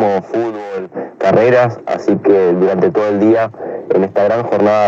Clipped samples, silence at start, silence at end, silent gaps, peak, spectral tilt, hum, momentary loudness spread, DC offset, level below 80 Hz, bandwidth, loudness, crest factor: under 0.1%; 0 s; 0 s; none; 0 dBFS; -8 dB/octave; none; 11 LU; under 0.1%; -62 dBFS; 7.6 kHz; -14 LUFS; 12 dB